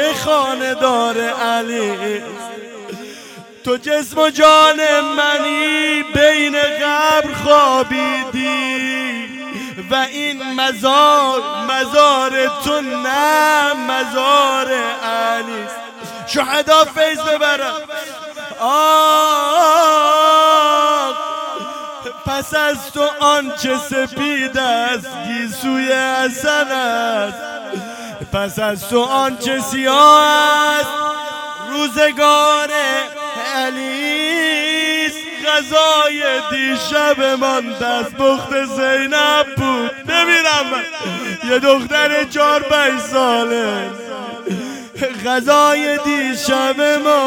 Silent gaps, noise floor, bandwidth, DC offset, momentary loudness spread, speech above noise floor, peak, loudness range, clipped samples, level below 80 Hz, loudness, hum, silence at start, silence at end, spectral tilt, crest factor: none; -37 dBFS; 18 kHz; under 0.1%; 14 LU; 22 dB; 0 dBFS; 5 LU; under 0.1%; -52 dBFS; -14 LUFS; none; 0 s; 0 s; -2.5 dB/octave; 16 dB